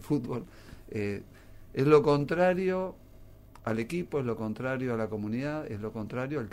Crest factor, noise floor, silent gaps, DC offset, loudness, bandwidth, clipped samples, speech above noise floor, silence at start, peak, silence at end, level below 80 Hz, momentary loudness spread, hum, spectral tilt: 22 dB; -51 dBFS; none; under 0.1%; -30 LUFS; 15.5 kHz; under 0.1%; 22 dB; 0 s; -8 dBFS; 0 s; -54 dBFS; 16 LU; none; -7.5 dB/octave